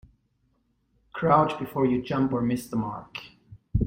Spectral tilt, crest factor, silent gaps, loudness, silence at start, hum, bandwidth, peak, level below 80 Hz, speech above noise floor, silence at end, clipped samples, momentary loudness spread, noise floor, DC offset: -7.5 dB/octave; 20 dB; none; -26 LUFS; 1.15 s; none; 16.5 kHz; -6 dBFS; -44 dBFS; 45 dB; 0 s; under 0.1%; 18 LU; -70 dBFS; under 0.1%